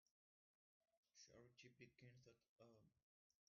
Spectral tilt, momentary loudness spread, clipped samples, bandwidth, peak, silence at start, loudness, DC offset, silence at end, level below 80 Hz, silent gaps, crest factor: -4.5 dB/octave; 2 LU; under 0.1%; 6.8 kHz; -52 dBFS; 0.05 s; -68 LUFS; under 0.1%; 0.15 s; under -90 dBFS; 0.11-0.81 s, 0.97-1.03 s, 2.48-2.56 s, 3.03-3.30 s; 22 dB